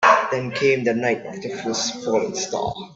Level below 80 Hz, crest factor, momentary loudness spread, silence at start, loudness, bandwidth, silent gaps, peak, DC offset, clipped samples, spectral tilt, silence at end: -58 dBFS; 20 dB; 8 LU; 0 s; -22 LUFS; 8 kHz; none; -2 dBFS; under 0.1%; under 0.1%; -3.5 dB/octave; 0 s